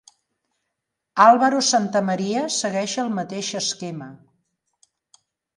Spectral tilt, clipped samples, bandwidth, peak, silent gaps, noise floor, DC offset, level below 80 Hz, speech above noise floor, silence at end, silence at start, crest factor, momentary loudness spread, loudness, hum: -3.5 dB/octave; under 0.1%; 11.5 kHz; 0 dBFS; none; -80 dBFS; under 0.1%; -74 dBFS; 60 dB; 1.4 s; 1.15 s; 22 dB; 16 LU; -20 LUFS; none